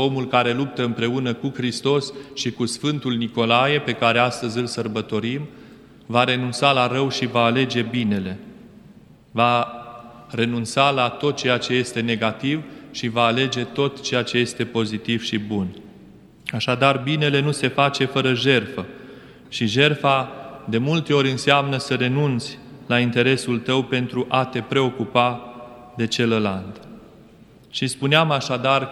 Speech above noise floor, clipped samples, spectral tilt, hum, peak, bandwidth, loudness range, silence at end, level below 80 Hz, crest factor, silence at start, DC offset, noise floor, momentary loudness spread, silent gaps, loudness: 28 dB; under 0.1%; -5 dB/octave; none; 0 dBFS; 12.5 kHz; 3 LU; 0 s; -60 dBFS; 22 dB; 0 s; under 0.1%; -48 dBFS; 13 LU; none; -21 LUFS